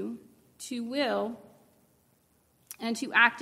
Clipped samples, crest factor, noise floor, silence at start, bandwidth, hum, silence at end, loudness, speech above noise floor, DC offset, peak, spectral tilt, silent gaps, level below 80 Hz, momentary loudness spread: under 0.1%; 24 dB; -68 dBFS; 0 s; 16 kHz; none; 0 s; -29 LUFS; 39 dB; under 0.1%; -8 dBFS; -3 dB/octave; none; -78 dBFS; 24 LU